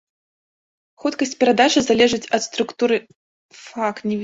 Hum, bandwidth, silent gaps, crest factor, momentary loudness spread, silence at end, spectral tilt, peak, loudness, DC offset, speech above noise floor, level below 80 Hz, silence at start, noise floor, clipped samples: none; 7.8 kHz; 3.16-3.49 s; 20 dB; 10 LU; 0 s; -3.5 dB/octave; 0 dBFS; -19 LUFS; under 0.1%; over 71 dB; -58 dBFS; 1.05 s; under -90 dBFS; under 0.1%